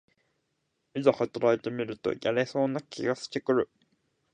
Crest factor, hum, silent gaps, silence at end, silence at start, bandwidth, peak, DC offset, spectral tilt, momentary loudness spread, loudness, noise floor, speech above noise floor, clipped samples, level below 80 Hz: 22 dB; none; none; 0.7 s; 0.95 s; 9.8 kHz; -8 dBFS; under 0.1%; -6 dB/octave; 6 LU; -29 LUFS; -78 dBFS; 50 dB; under 0.1%; -70 dBFS